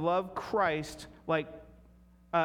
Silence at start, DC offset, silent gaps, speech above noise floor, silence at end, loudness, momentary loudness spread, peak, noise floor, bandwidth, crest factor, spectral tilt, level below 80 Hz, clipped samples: 0 s; under 0.1%; none; 27 dB; 0 s; -33 LUFS; 15 LU; -14 dBFS; -59 dBFS; 17.5 kHz; 18 dB; -5.5 dB/octave; -60 dBFS; under 0.1%